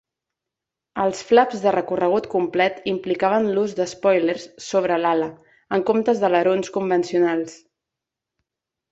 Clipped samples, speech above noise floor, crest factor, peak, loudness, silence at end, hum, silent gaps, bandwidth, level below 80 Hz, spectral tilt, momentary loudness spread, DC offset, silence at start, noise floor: under 0.1%; 65 dB; 20 dB; -2 dBFS; -21 LUFS; 1.35 s; none; none; 8 kHz; -64 dBFS; -5.5 dB/octave; 7 LU; under 0.1%; 0.95 s; -85 dBFS